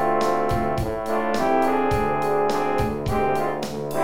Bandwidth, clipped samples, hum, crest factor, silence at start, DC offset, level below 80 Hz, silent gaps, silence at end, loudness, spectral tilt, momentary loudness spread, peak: 17 kHz; under 0.1%; none; 14 dB; 0 s; 2%; -40 dBFS; none; 0 s; -23 LUFS; -6 dB/octave; 5 LU; -8 dBFS